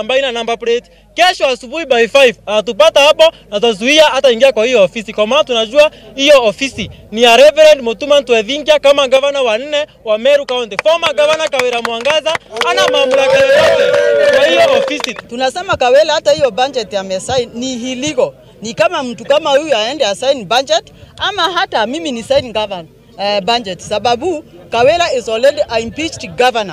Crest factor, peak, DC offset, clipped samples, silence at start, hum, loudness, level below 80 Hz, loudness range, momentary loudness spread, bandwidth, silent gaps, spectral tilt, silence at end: 12 dB; 0 dBFS; under 0.1%; 0.4%; 0 s; none; -12 LUFS; -48 dBFS; 6 LU; 11 LU; 15.5 kHz; none; -2.5 dB/octave; 0 s